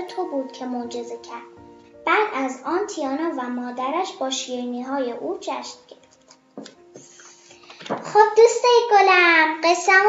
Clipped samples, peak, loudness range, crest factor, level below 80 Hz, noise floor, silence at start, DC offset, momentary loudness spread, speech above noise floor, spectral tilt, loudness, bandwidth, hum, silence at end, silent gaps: under 0.1%; -2 dBFS; 14 LU; 20 dB; -74 dBFS; -54 dBFS; 0 s; under 0.1%; 20 LU; 34 dB; -2 dB/octave; -20 LUFS; 8 kHz; none; 0 s; none